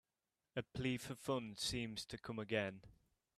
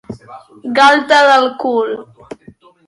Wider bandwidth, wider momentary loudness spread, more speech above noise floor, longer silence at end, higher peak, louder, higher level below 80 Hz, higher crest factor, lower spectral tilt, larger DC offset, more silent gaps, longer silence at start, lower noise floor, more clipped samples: first, 15 kHz vs 11.5 kHz; second, 7 LU vs 21 LU; first, over 46 dB vs 31 dB; second, 0.45 s vs 0.85 s; second, -24 dBFS vs 0 dBFS; second, -44 LUFS vs -11 LUFS; second, -68 dBFS vs -56 dBFS; first, 22 dB vs 14 dB; first, -4.5 dB/octave vs -3 dB/octave; neither; neither; first, 0.55 s vs 0.1 s; first, under -90 dBFS vs -43 dBFS; neither